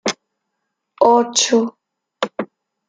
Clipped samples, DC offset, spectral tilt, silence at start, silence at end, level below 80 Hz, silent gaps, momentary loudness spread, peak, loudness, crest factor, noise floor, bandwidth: under 0.1%; under 0.1%; -2 dB/octave; 0.05 s; 0.45 s; -68 dBFS; none; 17 LU; -2 dBFS; -17 LUFS; 18 dB; -76 dBFS; 10 kHz